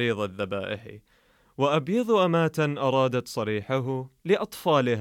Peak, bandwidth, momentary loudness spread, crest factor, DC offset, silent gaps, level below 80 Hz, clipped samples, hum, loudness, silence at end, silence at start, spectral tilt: -10 dBFS; 17 kHz; 9 LU; 16 dB; under 0.1%; none; -66 dBFS; under 0.1%; none; -26 LUFS; 0 s; 0 s; -6.5 dB/octave